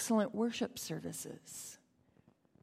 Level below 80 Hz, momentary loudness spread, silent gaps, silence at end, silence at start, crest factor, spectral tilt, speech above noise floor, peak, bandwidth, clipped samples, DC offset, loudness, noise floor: -76 dBFS; 15 LU; none; 0.85 s; 0 s; 18 dB; -4 dB/octave; 32 dB; -20 dBFS; 16 kHz; under 0.1%; under 0.1%; -39 LUFS; -69 dBFS